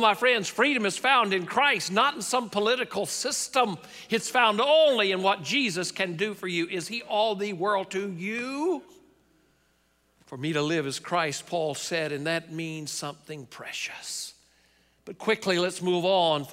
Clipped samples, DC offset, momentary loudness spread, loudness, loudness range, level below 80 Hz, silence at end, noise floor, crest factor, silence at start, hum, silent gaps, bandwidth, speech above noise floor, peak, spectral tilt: under 0.1%; under 0.1%; 12 LU; -26 LUFS; 8 LU; -72 dBFS; 0 s; -68 dBFS; 20 dB; 0 s; none; none; 16 kHz; 41 dB; -8 dBFS; -3 dB/octave